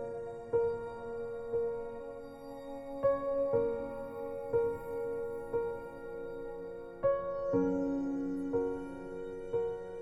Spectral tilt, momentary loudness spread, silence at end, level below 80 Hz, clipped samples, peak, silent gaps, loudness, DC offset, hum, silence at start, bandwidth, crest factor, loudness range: -8.5 dB/octave; 12 LU; 0 s; -58 dBFS; under 0.1%; -18 dBFS; none; -36 LUFS; under 0.1%; none; 0 s; 12 kHz; 16 dB; 2 LU